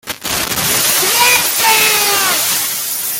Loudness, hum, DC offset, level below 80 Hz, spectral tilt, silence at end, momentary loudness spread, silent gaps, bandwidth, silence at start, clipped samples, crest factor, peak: -11 LUFS; none; under 0.1%; -48 dBFS; 0 dB/octave; 0 s; 7 LU; none; 17.5 kHz; 0.05 s; under 0.1%; 14 dB; 0 dBFS